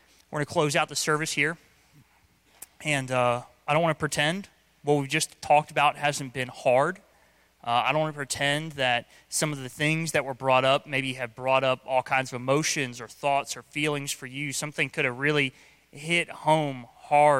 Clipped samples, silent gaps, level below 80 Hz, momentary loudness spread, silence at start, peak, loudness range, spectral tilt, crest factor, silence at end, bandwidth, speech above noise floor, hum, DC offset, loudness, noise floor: under 0.1%; none; -66 dBFS; 9 LU; 0.3 s; -8 dBFS; 3 LU; -3.5 dB/octave; 18 dB; 0 s; 16.5 kHz; 37 dB; none; under 0.1%; -26 LUFS; -63 dBFS